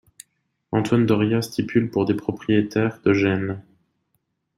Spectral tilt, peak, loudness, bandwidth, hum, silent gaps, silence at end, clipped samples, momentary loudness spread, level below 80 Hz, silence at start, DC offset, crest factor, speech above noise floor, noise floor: -7 dB/octave; -6 dBFS; -22 LUFS; 15 kHz; none; none; 0.95 s; under 0.1%; 7 LU; -58 dBFS; 0.7 s; under 0.1%; 18 dB; 52 dB; -73 dBFS